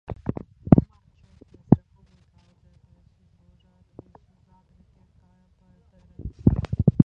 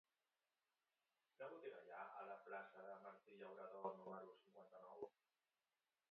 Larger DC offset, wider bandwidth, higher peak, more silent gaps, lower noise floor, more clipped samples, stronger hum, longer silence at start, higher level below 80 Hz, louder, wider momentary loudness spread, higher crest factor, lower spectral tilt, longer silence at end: neither; about the same, 4.9 kHz vs 4.5 kHz; first, 0 dBFS vs -36 dBFS; neither; second, -60 dBFS vs under -90 dBFS; neither; neither; second, 0.1 s vs 1.4 s; first, -40 dBFS vs under -90 dBFS; first, -22 LUFS vs -58 LUFS; first, 22 LU vs 10 LU; about the same, 26 dB vs 24 dB; first, -12 dB/octave vs -4 dB/octave; second, 0 s vs 1 s